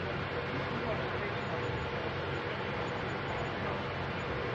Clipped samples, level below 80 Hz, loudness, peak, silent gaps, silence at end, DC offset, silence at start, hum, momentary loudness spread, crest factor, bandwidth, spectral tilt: under 0.1%; -54 dBFS; -35 LUFS; -24 dBFS; none; 0 s; under 0.1%; 0 s; none; 1 LU; 12 dB; 8.2 kHz; -6.5 dB/octave